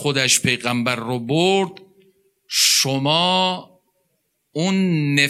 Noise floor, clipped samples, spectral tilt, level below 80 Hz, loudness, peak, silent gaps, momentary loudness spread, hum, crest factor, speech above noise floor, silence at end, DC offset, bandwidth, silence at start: -70 dBFS; under 0.1%; -3 dB/octave; -66 dBFS; -18 LUFS; -4 dBFS; none; 10 LU; none; 18 dB; 51 dB; 0 s; under 0.1%; 16 kHz; 0 s